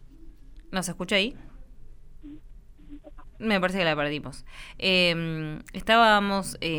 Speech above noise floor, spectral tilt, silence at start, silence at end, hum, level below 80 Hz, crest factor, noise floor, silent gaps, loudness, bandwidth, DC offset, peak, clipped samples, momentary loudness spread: 21 dB; -4 dB/octave; 0 s; 0 s; none; -46 dBFS; 22 dB; -46 dBFS; none; -24 LUFS; 20 kHz; under 0.1%; -6 dBFS; under 0.1%; 15 LU